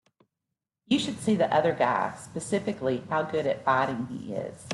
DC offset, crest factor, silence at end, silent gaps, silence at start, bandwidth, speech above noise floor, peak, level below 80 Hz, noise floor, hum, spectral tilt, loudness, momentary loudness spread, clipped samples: under 0.1%; 18 dB; 0 s; none; 0.9 s; 12 kHz; 59 dB; -10 dBFS; -66 dBFS; -86 dBFS; none; -5 dB/octave; -28 LUFS; 11 LU; under 0.1%